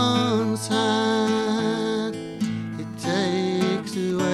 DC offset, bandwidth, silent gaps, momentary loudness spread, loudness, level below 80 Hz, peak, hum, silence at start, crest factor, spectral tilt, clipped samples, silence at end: under 0.1%; 13.5 kHz; none; 8 LU; -24 LUFS; -62 dBFS; -8 dBFS; none; 0 s; 14 dB; -5 dB/octave; under 0.1%; 0 s